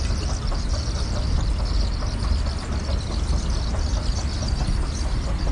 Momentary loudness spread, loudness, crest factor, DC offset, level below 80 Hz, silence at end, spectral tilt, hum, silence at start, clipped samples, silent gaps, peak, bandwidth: 2 LU; -26 LUFS; 12 dB; under 0.1%; -24 dBFS; 0 s; -5 dB/octave; none; 0 s; under 0.1%; none; -10 dBFS; 11 kHz